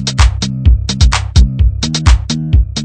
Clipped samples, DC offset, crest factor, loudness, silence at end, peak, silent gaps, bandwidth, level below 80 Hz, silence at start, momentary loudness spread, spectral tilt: 1%; under 0.1%; 10 dB; -13 LUFS; 0 s; 0 dBFS; none; 9.2 kHz; -12 dBFS; 0 s; 3 LU; -4.5 dB/octave